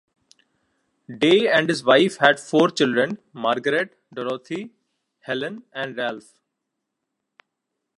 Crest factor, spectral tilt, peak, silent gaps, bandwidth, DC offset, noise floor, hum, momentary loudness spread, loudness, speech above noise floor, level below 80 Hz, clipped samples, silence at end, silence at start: 22 dB; -4.5 dB/octave; 0 dBFS; none; 11.5 kHz; under 0.1%; -80 dBFS; none; 16 LU; -21 LUFS; 60 dB; -74 dBFS; under 0.1%; 1.8 s; 1.1 s